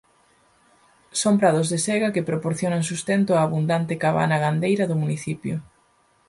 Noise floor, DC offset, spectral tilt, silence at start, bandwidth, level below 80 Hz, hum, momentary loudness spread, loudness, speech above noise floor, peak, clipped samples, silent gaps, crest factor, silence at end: -62 dBFS; under 0.1%; -5.5 dB/octave; 1.15 s; 11.5 kHz; -62 dBFS; none; 9 LU; -22 LUFS; 40 dB; -6 dBFS; under 0.1%; none; 18 dB; 0.65 s